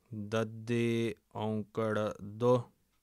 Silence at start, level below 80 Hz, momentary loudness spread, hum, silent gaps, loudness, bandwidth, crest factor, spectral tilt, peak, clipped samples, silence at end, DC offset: 0.1 s; -72 dBFS; 8 LU; none; none; -34 LUFS; 13 kHz; 16 dB; -7 dB/octave; -18 dBFS; under 0.1%; 0.35 s; under 0.1%